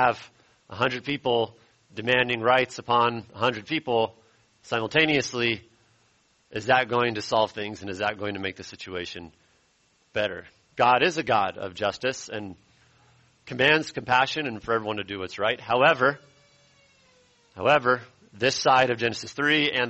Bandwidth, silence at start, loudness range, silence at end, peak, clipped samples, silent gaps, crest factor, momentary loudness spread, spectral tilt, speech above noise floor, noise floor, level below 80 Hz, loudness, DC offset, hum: 8.2 kHz; 0 s; 3 LU; 0 s; -6 dBFS; under 0.1%; none; 20 dB; 14 LU; -4 dB/octave; 41 dB; -66 dBFS; -62 dBFS; -24 LUFS; under 0.1%; none